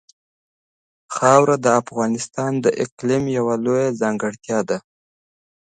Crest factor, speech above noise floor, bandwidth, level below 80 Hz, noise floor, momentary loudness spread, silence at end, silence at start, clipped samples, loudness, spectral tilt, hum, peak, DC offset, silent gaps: 20 dB; over 71 dB; 9.6 kHz; -60 dBFS; under -90 dBFS; 10 LU; 0.95 s; 1.1 s; under 0.1%; -19 LUFS; -5.5 dB/octave; none; 0 dBFS; under 0.1%; 2.92-2.97 s